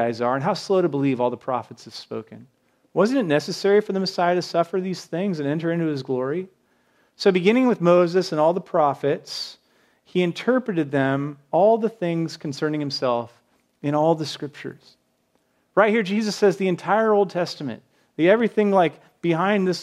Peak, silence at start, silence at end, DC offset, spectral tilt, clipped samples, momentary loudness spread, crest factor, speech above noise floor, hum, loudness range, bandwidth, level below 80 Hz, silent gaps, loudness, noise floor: -2 dBFS; 0 s; 0 s; under 0.1%; -6 dB/octave; under 0.1%; 13 LU; 20 dB; 46 dB; none; 4 LU; 13.5 kHz; -76 dBFS; none; -22 LUFS; -67 dBFS